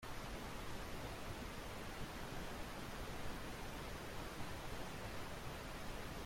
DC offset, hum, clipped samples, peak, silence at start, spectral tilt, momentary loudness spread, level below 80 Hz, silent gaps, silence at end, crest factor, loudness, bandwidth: under 0.1%; none; under 0.1%; -34 dBFS; 0 s; -4.5 dB/octave; 1 LU; -54 dBFS; none; 0 s; 14 dB; -49 LUFS; 16.5 kHz